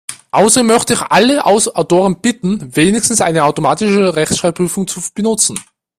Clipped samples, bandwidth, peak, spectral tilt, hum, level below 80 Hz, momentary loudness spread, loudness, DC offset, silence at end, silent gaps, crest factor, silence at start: under 0.1%; 16 kHz; 0 dBFS; -3.5 dB/octave; none; -48 dBFS; 7 LU; -12 LUFS; under 0.1%; 0.35 s; none; 12 dB; 0.1 s